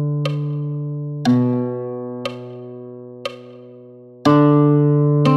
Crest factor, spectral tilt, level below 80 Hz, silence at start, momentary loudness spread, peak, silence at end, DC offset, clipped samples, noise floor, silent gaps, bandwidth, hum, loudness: 16 dB; -8.5 dB/octave; -62 dBFS; 0 s; 21 LU; -2 dBFS; 0 s; under 0.1%; under 0.1%; -41 dBFS; none; 8 kHz; none; -18 LUFS